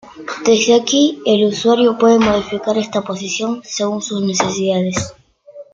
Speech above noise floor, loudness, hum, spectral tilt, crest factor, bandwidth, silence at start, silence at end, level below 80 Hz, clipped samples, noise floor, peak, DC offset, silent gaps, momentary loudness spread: 24 dB; -15 LUFS; none; -4 dB/octave; 16 dB; 9.2 kHz; 0.05 s; 0.1 s; -50 dBFS; under 0.1%; -39 dBFS; 0 dBFS; under 0.1%; none; 9 LU